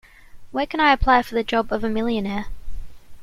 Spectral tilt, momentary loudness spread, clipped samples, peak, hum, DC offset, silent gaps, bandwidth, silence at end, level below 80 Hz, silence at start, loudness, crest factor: -6 dB/octave; 18 LU; under 0.1%; -4 dBFS; none; under 0.1%; none; 14.5 kHz; 0 s; -34 dBFS; 0.35 s; -21 LUFS; 18 dB